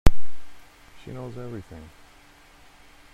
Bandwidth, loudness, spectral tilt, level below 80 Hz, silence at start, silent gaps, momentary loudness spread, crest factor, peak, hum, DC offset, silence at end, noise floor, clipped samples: 11.5 kHz; -35 LUFS; -6.5 dB/octave; -32 dBFS; 0.05 s; none; 16 LU; 20 dB; 0 dBFS; none; under 0.1%; 0 s; -52 dBFS; under 0.1%